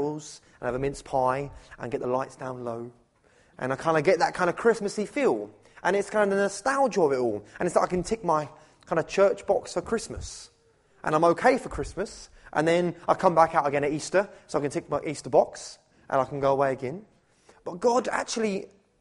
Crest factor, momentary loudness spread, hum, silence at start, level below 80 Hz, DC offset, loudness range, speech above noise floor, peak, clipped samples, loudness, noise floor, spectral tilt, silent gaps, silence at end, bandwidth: 20 dB; 14 LU; none; 0 s; -54 dBFS; under 0.1%; 4 LU; 36 dB; -6 dBFS; under 0.1%; -26 LUFS; -62 dBFS; -5 dB/octave; none; 0.35 s; 11.5 kHz